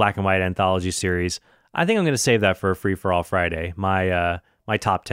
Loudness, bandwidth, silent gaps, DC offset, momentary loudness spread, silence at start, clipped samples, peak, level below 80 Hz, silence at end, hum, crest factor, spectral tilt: -22 LUFS; 16 kHz; none; under 0.1%; 7 LU; 0 s; under 0.1%; -4 dBFS; -46 dBFS; 0 s; none; 18 dB; -5 dB/octave